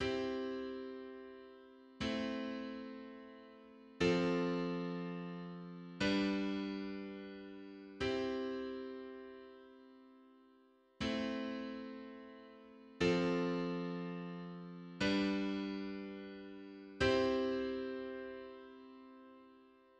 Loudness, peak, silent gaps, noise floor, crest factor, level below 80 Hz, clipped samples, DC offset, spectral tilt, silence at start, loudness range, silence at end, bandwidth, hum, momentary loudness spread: -39 LUFS; -20 dBFS; none; -68 dBFS; 20 dB; -64 dBFS; under 0.1%; under 0.1%; -6 dB/octave; 0 s; 7 LU; 0.3 s; 9.4 kHz; none; 23 LU